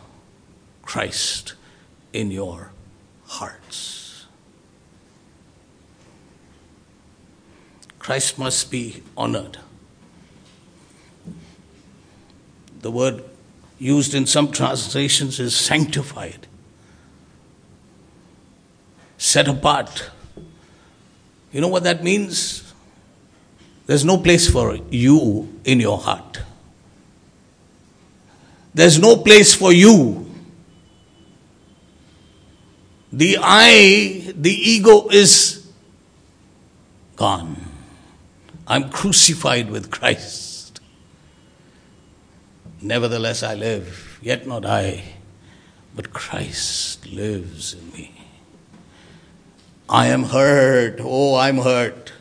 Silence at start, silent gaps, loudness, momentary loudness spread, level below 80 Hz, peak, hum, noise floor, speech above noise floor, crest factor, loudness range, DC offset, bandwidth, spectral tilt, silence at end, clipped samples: 0.85 s; none; -15 LUFS; 24 LU; -44 dBFS; 0 dBFS; none; -53 dBFS; 37 dB; 20 dB; 19 LU; under 0.1%; 11 kHz; -3.5 dB/octave; 0.1 s; 0.1%